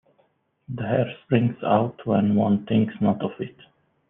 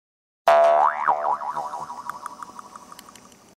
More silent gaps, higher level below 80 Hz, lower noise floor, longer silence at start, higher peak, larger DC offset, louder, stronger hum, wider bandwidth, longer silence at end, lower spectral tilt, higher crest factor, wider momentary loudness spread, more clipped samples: neither; first, -62 dBFS vs -70 dBFS; first, -66 dBFS vs -49 dBFS; first, 0.7 s vs 0.45 s; about the same, -6 dBFS vs -4 dBFS; neither; about the same, -23 LUFS vs -21 LUFS; neither; second, 3.8 kHz vs 15.5 kHz; second, 0.6 s vs 0.8 s; first, -11 dB/octave vs -2.5 dB/octave; about the same, 18 dB vs 18 dB; second, 12 LU vs 24 LU; neither